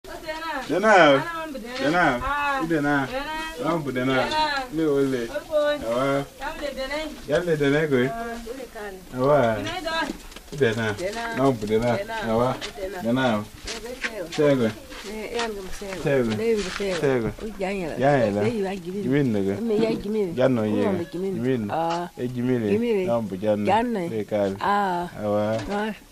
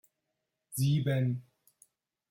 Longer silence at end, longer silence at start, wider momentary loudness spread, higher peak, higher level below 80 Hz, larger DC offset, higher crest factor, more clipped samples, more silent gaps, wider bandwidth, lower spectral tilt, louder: second, 0.1 s vs 0.9 s; second, 0.05 s vs 0.7 s; about the same, 10 LU vs 12 LU; first, -2 dBFS vs -18 dBFS; first, -46 dBFS vs -68 dBFS; neither; first, 22 dB vs 16 dB; neither; neither; about the same, 15.5 kHz vs 16.5 kHz; about the same, -5.5 dB/octave vs -6.5 dB/octave; first, -24 LUFS vs -31 LUFS